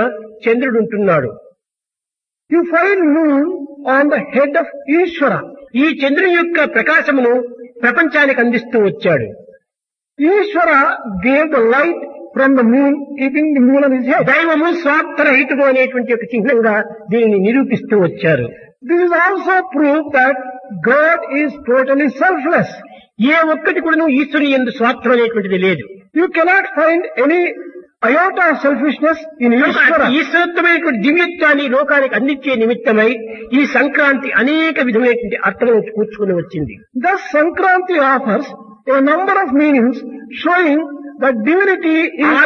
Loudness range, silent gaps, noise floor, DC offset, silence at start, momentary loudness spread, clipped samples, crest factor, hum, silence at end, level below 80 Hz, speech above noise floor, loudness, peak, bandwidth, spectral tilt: 3 LU; none; -86 dBFS; under 0.1%; 0 s; 7 LU; under 0.1%; 14 dB; none; 0 s; -56 dBFS; 73 dB; -13 LUFS; 0 dBFS; 6.6 kHz; -7 dB/octave